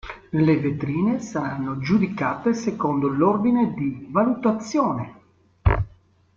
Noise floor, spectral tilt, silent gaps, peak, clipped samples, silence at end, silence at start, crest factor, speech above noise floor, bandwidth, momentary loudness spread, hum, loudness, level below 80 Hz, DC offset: -53 dBFS; -7.5 dB/octave; none; -6 dBFS; under 0.1%; 0.5 s; 0.05 s; 18 dB; 31 dB; 7.4 kHz; 8 LU; none; -23 LUFS; -38 dBFS; under 0.1%